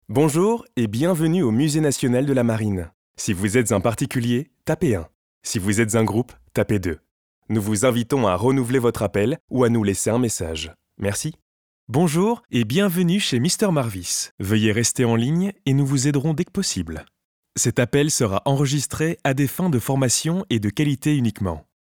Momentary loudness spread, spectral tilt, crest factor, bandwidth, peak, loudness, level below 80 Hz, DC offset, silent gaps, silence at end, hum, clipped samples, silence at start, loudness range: 8 LU; -5 dB/octave; 16 dB; over 20 kHz; -6 dBFS; -21 LUFS; -52 dBFS; 0.1%; 2.94-3.14 s, 5.15-5.41 s, 7.11-7.42 s, 9.40-9.48 s, 11.42-11.87 s, 14.31-14.38 s, 17.24-17.43 s; 0.2 s; none; under 0.1%; 0.1 s; 3 LU